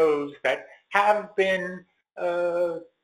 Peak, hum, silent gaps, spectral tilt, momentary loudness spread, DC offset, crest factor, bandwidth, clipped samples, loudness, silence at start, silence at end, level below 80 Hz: -6 dBFS; none; none; -5 dB/octave; 10 LU; under 0.1%; 20 dB; 14 kHz; under 0.1%; -25 LUFS; 0 s; 0.2 s; -68 dBFS